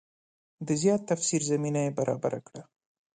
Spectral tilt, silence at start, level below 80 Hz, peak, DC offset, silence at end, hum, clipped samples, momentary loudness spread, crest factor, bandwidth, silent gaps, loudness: -5 dB/octave; 0.6 s; -70 dBFS; -12 dBFS; under 0.1%; 0.5 s; none; under 0.1%; 16 LU; 18 dB; 9.6 kHz; none; -28 LUFS